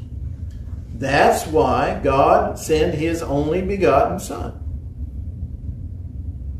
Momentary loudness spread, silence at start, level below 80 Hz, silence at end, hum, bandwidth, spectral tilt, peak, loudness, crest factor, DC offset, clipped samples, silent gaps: 16 LU; 0 s; -32 dBFS; 0 s; none; 14.5 kHz; -6 dB/octave; -2 dBFS; -19 LUFS; 18 dB; under 0.1%; under 0.1%; none